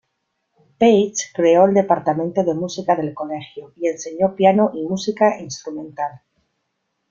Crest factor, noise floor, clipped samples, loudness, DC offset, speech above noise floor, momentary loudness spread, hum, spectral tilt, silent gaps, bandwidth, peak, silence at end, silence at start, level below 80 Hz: 18 dB; -73 dBFS; under 0.1%; -18 LUFS; under 0.1%; 55 dB; 14 LU; none; -5.5 dB/octave; none; 7.6 kHz; -2 dBFS; 0.95 s; 0.8 s; -62 dBFS